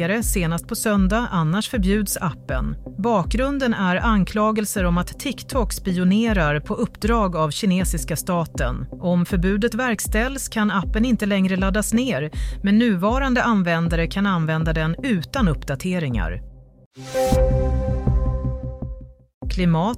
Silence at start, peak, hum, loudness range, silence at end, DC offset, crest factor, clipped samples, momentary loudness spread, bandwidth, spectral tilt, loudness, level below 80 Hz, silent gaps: 0 s; -6 dBFS; none; 3 LU; 0 s; under 0.1%; 14 dB; under 0.1%; 8 LU; 16 kHz; -5.5 dB/octave; -21 LUFS; -28 dBFS; 16.86-16.91 s, 19.34-19.41 s